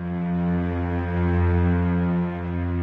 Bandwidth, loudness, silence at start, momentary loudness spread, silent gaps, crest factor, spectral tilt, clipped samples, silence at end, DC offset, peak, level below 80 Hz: 4 kHz; -24 LUFS; 0 s; 6 LU; none; 12 dB; -11 dB/octave; under 0.1%; 0 s; under 0.1%; -10 dBFS; -42 dBFS